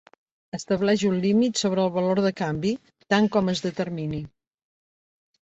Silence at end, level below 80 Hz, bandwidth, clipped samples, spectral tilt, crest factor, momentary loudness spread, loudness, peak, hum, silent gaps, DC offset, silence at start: 1.15 s; -58 dBFS; 8.2 kHz; under 0.1%; -5.5 dB/octave; 18 dB; 13 LU; -24 LUFS; -8 dBFS; none; none; under 0.1%; 0.55 s